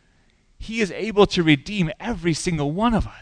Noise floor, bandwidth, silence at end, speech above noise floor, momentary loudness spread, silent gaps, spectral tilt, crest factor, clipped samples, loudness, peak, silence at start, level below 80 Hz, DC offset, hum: -59 dBFS; 10.5 kHz; 0 s; 38 dB; 8 LU; none; -5.5 dB/octave; 20 dB; under 0.1%; -21 LUFS; -2 dBFS; 0.6 s; -38 dBFS; under 0.1%; none